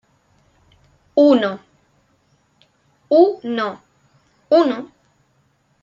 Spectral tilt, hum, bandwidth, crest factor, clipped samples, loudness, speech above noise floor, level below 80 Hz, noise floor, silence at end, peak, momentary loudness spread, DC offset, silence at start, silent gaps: -6.5 dB/octave; none; 7.4 kHz; 18 dB; under 0.1%; -17 LUFS; 47 dB; -68 dBFS; -62 dBFS; 0.95 s; -2 dBFS; 19 LU; under 0.1%; 1.15 s; none